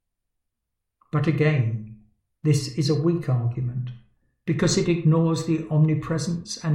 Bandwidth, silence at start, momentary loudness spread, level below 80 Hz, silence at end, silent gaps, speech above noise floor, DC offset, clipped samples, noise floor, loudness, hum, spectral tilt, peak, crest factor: 11.5 kHz; 1.15 s; 9 LU; -54 dBFS; 0 s; none; 59 dB; under 0.1%; under 0.1%; -81 dBFS; -23 LUFS; none; -6.5 dB/octave; -8 dBFS; 16 dB